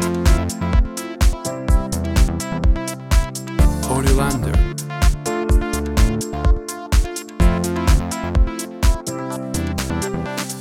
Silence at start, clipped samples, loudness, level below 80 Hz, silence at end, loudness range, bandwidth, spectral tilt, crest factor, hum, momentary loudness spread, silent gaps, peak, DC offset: 0 s; under 0.1%; -20 LUFS; -20 dBFS; 0 s; 1 LU; 16 kHz; -5.5 dB/octave; 16 dB; none; 6 LU; none; -2 dBFS; 0.2%